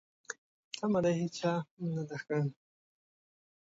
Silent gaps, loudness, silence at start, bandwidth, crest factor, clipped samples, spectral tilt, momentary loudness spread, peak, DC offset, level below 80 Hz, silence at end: 0.38-0.71 s, 1.71-1.77 s; -34 LUFS; 0.3 s; 7.8 kHz; 18 dB; under 0.1%; -6.5 dB/octave; 16 LU; -18 dBFS; under 0.1%; -74 dBFS; 1.1 s